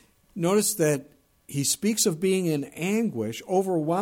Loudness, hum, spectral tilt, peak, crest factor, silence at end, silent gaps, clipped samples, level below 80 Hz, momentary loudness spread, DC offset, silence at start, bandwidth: -25 LUFS; none; -4.5 dB/octave; -10 dBFS; 16 dB; 0 s; none; under 0.1%; -66 dBFS; 8 LU; under 0.1%; 0.35 s; 17 kHz